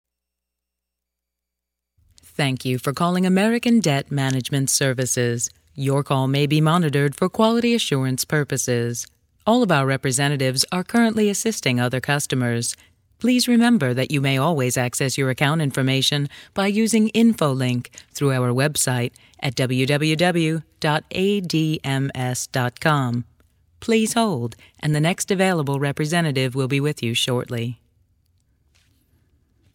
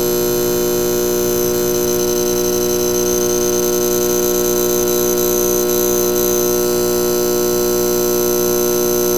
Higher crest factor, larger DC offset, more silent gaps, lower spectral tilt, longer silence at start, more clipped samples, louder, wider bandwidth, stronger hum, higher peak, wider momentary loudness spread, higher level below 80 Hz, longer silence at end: first, 20 dB vs 12 dB; second, under 0.1% vs 2%; neither; about the same, -4.5 dB/octave vs -3.5 dB/octave; first, 2.4 s vs 0 s; neither; second, -21 LUFS vs -15 LUFS; about the same, 17 kHz vs 18.5 kHz; second, none vs 60 Hz at -25 dBFS; about the same, -2 dBFS vs -2 dBFS; first, 8 LU vs 1 LU; second, -58 dBFS vs -40 dBFS; first, 2 s vs 0 s